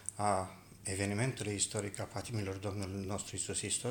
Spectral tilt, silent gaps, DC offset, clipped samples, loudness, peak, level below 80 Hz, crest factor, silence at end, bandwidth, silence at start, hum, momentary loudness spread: -4 dB/octave; none; under 0.1%; under 0.1%; -37 LUFS; -16 dBFS; -64 dBFS; 20 dB; 0 s; 19.5 kHz; 0 s; none; 6 LU